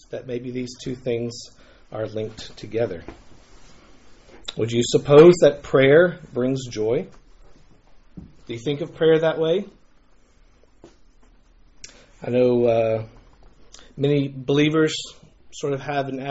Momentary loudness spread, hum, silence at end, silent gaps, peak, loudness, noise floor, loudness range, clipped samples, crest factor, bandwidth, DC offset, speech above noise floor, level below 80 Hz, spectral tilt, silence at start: 21 LU; none; 0 s; none; -2 dBFS; -20 LUFS; -54 dBFS; 13 LU; under 0.1%; 20 dB; 8 kHz; under 0.1%; 34 dB; -52 dBFS; -5.5 dB/octave; 0.1 s